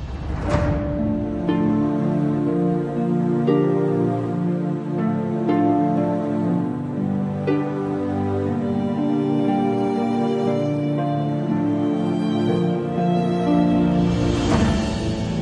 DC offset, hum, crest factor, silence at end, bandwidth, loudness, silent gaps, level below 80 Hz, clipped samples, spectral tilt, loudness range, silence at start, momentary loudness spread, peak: under 0.1%; none; 14 dB; 0 s; 10 kHz; -21 LUFS; none; -38 dBFS; under 0.1%; -8 dB/octave; 2 LU; 0 s; 5 LU; -6 dBFS